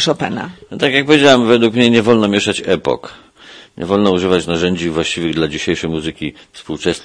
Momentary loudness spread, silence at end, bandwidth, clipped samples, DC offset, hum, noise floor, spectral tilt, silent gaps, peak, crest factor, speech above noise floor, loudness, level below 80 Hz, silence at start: 14 LU; 0 s; 11 kHz; under 0.1%; under 0.1%; none; -40 dBFS; -5 dB/octave; none; 0 dBFS; 14 dB; 26 dB; -14 LUFS; -46 dBFS; 0 s